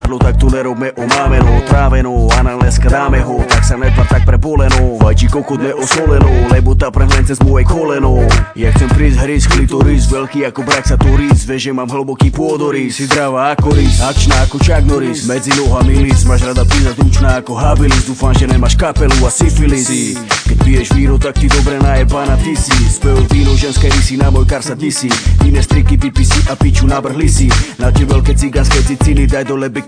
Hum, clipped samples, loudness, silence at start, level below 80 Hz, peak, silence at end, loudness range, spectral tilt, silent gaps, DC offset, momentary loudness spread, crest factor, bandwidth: none; 0.3%; -11 LUFS; 0 s; -12 dBFS; 0 dBFS; 0 s; 1 LU; -5.5 dB/octave; none; 0.4%; 4 LU; 10 dB; 10.5 kHz